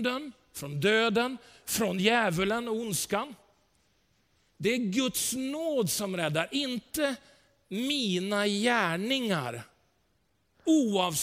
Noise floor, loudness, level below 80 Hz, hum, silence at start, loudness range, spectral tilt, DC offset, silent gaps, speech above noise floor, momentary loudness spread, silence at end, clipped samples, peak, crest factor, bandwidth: -73 dBFS; -29 LUFS; -64 dBFS; none; 0 s; 3 LU; -3.5 dB/octave; under 0.1%; none; 44 dB; 12 LU; 0 s; under 0.1%; -10 dBFS; 20 dB; 16.5 kHz